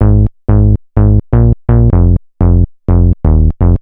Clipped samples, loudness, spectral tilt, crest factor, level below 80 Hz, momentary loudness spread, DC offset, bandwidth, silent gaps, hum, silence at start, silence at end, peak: under 0.1%; -11 LUFS; -14 dB/octave; 8 dB; -12 dBFS; 3 LU; under 0.1%; 2.4 kHz; none; none; 0 s; 0.05 s; 0 dBFS